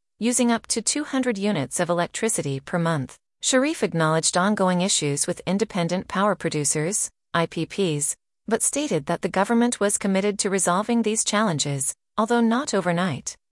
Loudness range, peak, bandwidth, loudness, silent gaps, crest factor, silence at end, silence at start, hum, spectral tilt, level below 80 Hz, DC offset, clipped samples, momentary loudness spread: 2 LU; -6 dBFS; 12 kHz; -23 LUFS; none; 16 dB; 0.2 s; 0.2 s; none; -4 dB/octave; -62 dBFS; under 0.1%; under 0.1%; 5 LU